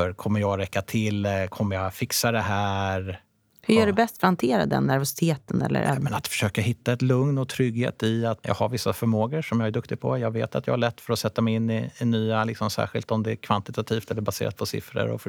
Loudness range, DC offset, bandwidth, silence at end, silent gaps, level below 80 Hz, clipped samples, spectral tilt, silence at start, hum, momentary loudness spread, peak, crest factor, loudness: 3 LU; under 0.1%; over 20 kHz; 0 s; none; -58 dBFS; under 0.1%; -5.5 dB/octave; 0 s; none; 6 LU; -6 dBFS; 20 dB; -25 LUFS